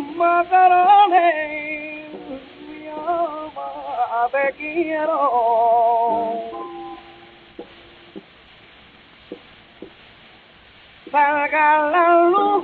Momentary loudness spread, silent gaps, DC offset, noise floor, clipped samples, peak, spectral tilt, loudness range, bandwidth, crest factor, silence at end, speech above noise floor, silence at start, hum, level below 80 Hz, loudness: 21 LU; none; under 0.1%; -48 dBFS; under 0.1%; -4 dBFS; -7 dB/octave; 13 LU; 4.5 kHz; 16 dB; 0 s; 32 dB; 0 s; none; -62 dBFS; -17 LUFS